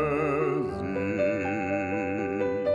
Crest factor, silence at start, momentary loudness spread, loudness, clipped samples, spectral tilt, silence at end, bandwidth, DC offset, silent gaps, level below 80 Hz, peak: 12 dB; 0 s; 4 LU; -28 LUFS; under 0.1%; -8 dB/octave; 0 s; 10.5 kHz; under 0.1%; none; -56 dBFS; -14 dBFS